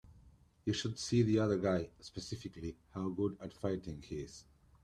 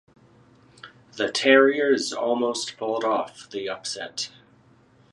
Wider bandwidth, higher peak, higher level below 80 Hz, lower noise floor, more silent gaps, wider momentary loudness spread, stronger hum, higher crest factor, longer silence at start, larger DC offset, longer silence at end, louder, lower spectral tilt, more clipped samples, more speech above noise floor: about the same, 11.5 kHz vs 11.5 kHz; second, -18 dBFS vs -4 dBFS; first, -62 dBFS vs -72 dBFS; first, -64 dBFS vs -57 dBFS; neither; about the same, 15 LU vs 16 LU; neither; about the same, 18 dB vs 22 dB; second, 0.05 s vs 0.85 s; neither; second, 0.4 s vs 0.85 s; second, -37 LUFS vs -23 LUFS; first, -6 dB/octave vs -2.5 dB/octave; neither; second, 27 dB vs 34 dB